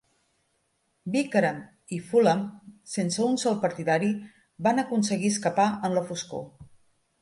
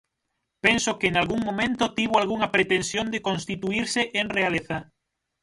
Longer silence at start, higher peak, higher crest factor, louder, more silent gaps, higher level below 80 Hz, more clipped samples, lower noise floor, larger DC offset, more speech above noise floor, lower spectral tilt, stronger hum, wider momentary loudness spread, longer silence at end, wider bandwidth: first, 1.05 s vs 0.65 s; second, -8 dBFS vs -4 dBFS; about the same, 18 dB vs 20 dB; about the same, -26 LUFS vs -24 LUFS; neither; second, -68 dBFS vs -54 dBFS; neither; second, -73 dBFS vs -79 dBFS; neither; second, 47 dB vs 55 dB; first, -5 dB/octave vs -3.5 dB/octave; neither; first, 13 LU vs 6 LU; about the same, 0.55 s vs 0.6 s; about the same, 11.5 kHz vs 11.5 kHz